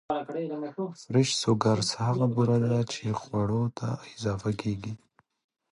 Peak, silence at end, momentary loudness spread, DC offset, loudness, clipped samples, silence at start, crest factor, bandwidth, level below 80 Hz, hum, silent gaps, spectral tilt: -8 dBFS; 0.75 s; 10 LU; under 0.1%; -28 LUFS; under 0.1%; 0.1 s; 20 dB; 11 kHz; -58 dBFS; none; none; -6 dB/octave